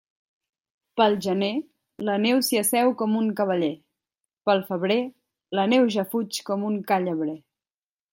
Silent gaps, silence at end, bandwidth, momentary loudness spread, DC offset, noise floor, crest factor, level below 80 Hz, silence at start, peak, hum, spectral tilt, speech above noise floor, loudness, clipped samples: none; 0.75 s; 16.5 kHz; 11 LU; under 0.1%; under -90 dBFS; 20 dB; -74 dBFS; 0.95 s; -4 dBFS; none; -4.5 dB/octave; over 67 dB; -24 LUFS; under 0.1%